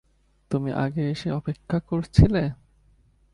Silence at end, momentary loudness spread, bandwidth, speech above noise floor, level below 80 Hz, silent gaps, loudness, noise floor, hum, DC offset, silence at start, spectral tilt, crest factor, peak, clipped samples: 0.8 s; 11 LU; 11 kHz; 37 dB; -36 dBFS; none; -24 LUFS; -60 dBFS; none; under 0.1%; 0.5 s; -8.5 dB/octave; 24 dB; 0 dBFS; under 0.1%